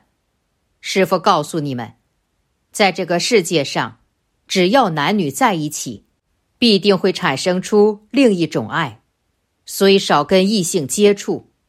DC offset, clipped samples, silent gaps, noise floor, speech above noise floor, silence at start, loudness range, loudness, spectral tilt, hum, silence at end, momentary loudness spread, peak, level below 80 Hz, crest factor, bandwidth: under 0.1%; under 0.1%; none; -68 dBFS; 52 dB; 0.85 s; 3 LU; -16 LUFS; -4.5 dB/octave; none; 0.3 s; 12 LU; 0 dBFS; -60 dBFS; 16 dB; 15.5 kHz